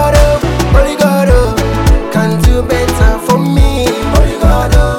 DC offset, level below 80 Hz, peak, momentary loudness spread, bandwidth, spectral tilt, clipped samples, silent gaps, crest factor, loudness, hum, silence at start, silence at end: under 0.1%; -12 dBFS; 0 dBFS; 3 LU; 16.5 kHz; -6 dB/octave; 2%; none; 8 dB; -11 LUFS; none; 0 s; 0 s